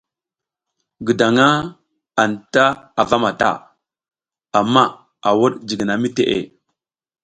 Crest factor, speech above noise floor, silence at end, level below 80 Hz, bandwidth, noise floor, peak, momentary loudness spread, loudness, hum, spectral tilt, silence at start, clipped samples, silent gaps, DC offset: 18 dB; 71 dB; 0.75 s; -56 dBFS; 9.4 kHz; -87 dBFS; 0 dBFS; 10 LU; -17 LUFS; none; -5 dB/octave; 1 s; under 0.1%; none; under 0.1%